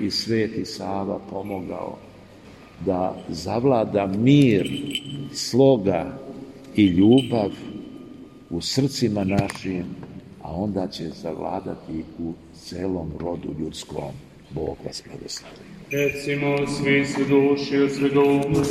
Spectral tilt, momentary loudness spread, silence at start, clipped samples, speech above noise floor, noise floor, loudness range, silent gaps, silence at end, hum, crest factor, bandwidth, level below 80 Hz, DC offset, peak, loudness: -6 dB/octave; 19 LU; 0 s; under 0.1%; 23 dB; -45 dBFS; 10 LU; none; 0 s; none; 18 dB; 13.5 kHz; -50 dBFS; under 0.1%; -4 dBFS; -23 LUFS